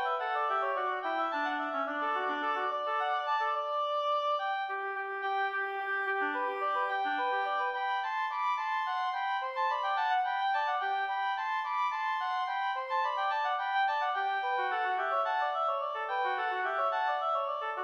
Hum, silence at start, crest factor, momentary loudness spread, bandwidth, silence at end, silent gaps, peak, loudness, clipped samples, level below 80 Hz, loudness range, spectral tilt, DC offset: none; 0 s; 12 dB; 3 LU; 7.4 kHz; 0 s; none; -20 dBFS; -32 LUFS; under 0.1%; -86 dBFS; 1 LU; -1 dB/octave; under 0.1%